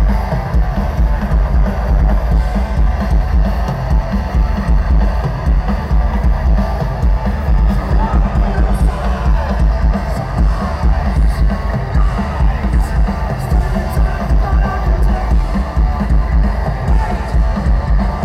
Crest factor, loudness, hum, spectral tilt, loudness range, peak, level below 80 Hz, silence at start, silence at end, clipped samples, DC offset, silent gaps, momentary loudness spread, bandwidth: 12 dB; -16 LUFS; none; -8 dB/octave; 1 LU; 0 dBFS; -14 dBFS; 0 s; 0 s; under 0.1%; under 0.1%; none; 3 LU; 6.4 kHz